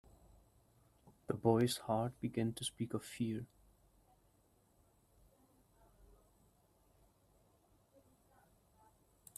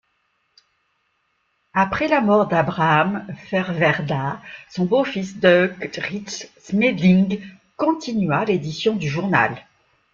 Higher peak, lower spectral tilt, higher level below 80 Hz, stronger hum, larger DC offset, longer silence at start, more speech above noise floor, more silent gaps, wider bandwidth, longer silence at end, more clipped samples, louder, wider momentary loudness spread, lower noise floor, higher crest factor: second, -18 dBFS vs -2 dBFS; about the same, -5.5 dB/octave vs -6.5 dB/octave; second, -70 dBFS vs -56 dBFS; neither; neither; second, 1.3 s vs 1.75 s; second, 36 dB vs 49 dB; neither; first, 14.5 kHz vs 7.4 kHz; first, 5.95 s vs 0.5 s; neither; second, -38 LUFS vs -20 LUFS; about the same, 13 LU vs 13 LU; first, -73 dBFS vs -69 dBFS; first, 26 dB vs 20 dB